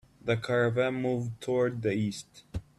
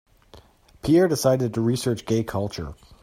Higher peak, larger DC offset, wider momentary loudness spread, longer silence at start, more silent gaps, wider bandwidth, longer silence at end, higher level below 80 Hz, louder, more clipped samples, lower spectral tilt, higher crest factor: second, -14 dBFS vs -8 dBFS; neither; about the same, 13 LU vs 13 LU; about the same, 0.25 s vs 0.35 s; neither; second, 12.5 kHz vs 16 kHz; second, 0.15 s vs 0.3 s; second, -54 dBFS vs -48 dBFS; second, -30 LUFS vs -23 LUFS; neither; about the same, -6.5 dB/octave vs -6 dB/octave; about the same, 16 dB vs 16 dB